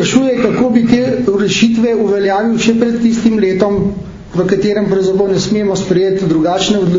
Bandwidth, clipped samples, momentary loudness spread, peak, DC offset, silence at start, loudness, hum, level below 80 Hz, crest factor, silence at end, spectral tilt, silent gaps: 7.6 kHz; under 0.1%; 3 LU; 0 dBFS; under 0.1%; 0 s; -12 LUFS; none; -40 dBFS; 12 dB; 0 s; -5.5 dB/octave; none